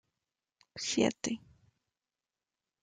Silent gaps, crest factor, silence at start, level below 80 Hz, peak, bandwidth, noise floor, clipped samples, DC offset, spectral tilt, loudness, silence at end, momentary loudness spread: none; 26 dB; 0.75 s; -72 dBFS; -14 dBFS; 9.6 kHz; under -90 dBFS; under 0.1%; under 0.1%; -3.5 dB/octave; -34 LUFS; 1.45 s; 13 LU